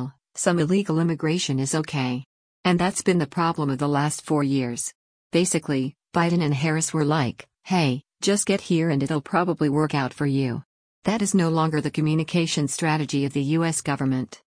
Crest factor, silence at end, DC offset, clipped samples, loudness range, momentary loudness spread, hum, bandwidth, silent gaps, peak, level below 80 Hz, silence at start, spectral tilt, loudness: 16 dB; 0.2 s; under 0.1%; under 0.1%; 1 LU; 5 LU; none; 10.5 kHz; 2.26-2.63 s, 4.95-5.30 s, 10.65-11.02 s; -8 dBFS; -60 dBFS; 0 s; -5 dB/octave; -23 LUFS